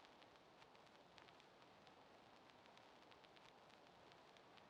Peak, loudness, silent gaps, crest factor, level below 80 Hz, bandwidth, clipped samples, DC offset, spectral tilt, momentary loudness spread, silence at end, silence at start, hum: -40 dBFS; -67 LUFS; none; 26 dB; under -90 dBFS; 9.6 kHz; under 0.1%; under 0.1%; -3.5 dB/octave; 2 LU; 0 s; 0 s; none